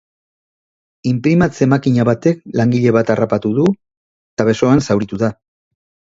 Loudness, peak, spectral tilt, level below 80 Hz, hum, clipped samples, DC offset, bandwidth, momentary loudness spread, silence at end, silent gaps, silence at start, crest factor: -15 LUFS; 0 dBFS; -7.5 dB/octave; -48 dBFS; none; under 0.1%; under 0.1%; 7.8 kHz; 7 LU; 0.8 s; 3.97-4.37 s; 1.05 s; 16 dB